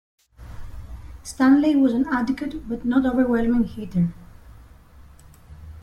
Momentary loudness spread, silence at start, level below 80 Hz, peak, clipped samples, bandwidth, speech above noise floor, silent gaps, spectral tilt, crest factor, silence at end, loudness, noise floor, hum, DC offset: 24 LU; 0.4 s; -42 dBFS; -6 dBFS; under 0.1%; 12 kHz; 27 dB; none; -7 dB/octave; 16 dB; 0 s; -21 LUFS; -47 dBFS; none; under 0.1%